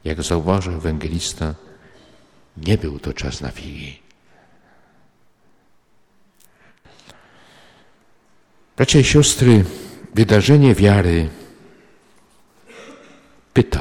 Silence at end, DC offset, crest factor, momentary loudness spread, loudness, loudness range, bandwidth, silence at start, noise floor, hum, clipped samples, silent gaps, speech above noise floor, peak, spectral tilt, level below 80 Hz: 0 s; under 0.1%; 18 dB; 20 LU; -16 LUFS; 14 LU; 16.5 kHz; 0.05 s; -54 dBFS; none; under 0.1%; none; 39 dB; -2 dBFS; -5.5 dB/octave; -34 dBFS